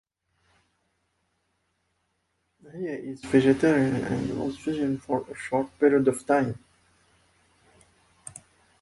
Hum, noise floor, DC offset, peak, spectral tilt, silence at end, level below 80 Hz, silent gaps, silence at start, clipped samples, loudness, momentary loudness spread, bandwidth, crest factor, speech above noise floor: none; -75 dBFS; under 0.1%; -8 dBFS; -6.5 dB/octave; 0.45 s; -60 dBFS; none; 2.65 s; under 0.1%; -25 LUFS; 22 LU; 11.5 kHz; 20 dB; 50 dB